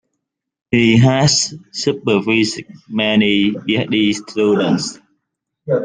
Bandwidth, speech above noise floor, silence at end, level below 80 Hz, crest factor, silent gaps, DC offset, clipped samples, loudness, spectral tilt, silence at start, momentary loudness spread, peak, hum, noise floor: 9.8 kHz; 61 dB; 0 s; -52 dBFS; 16 dB; none; under 0.1%; under 0.1%; -16 LUFS; -4.5 dB/octave; 0.7 s; 10 LU; 0 dBFS; none; -76 dBFS